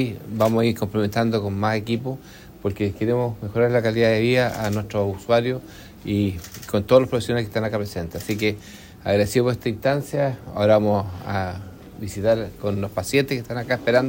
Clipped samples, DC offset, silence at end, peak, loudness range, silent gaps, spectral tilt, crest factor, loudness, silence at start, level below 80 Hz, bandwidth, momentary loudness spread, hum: under 0.1%; under 0.1%; 0 s; -2 dBFS; 2 LU; none; -6.5 dB/octave; 20 dB; -22 LUFS; 0 s; -50 dBFS; 16.5 kHz; 12 LU; none